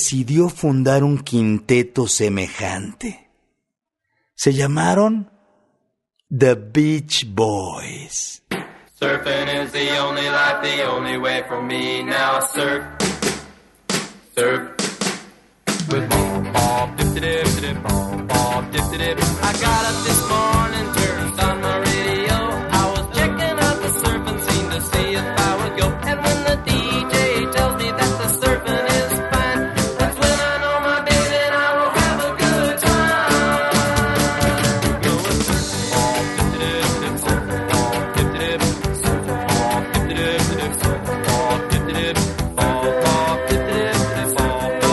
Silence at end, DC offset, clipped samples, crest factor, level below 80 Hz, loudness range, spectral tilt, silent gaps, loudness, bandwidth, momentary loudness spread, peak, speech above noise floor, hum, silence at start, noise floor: 0 s; under 0.1%; under 0.1%; 18 dB; -34 dBFS; 4 LU; -4 dB/octave; none; -19 LUFS; 12.5 kHz; 6 LU; -2 dBFS; 60 dB; none; 0 s; -79 dBFS